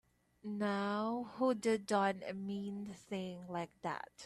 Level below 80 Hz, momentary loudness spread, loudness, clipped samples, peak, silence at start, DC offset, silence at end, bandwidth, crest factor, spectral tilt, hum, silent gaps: -78 dBFS; 10 LU; -39 LUFS; under 0.1%; -22 dBFS; 0.45 s; under 0.1%; 0 s; 12.5 kHz; 18 dB; -5.5 dB/octave; none; none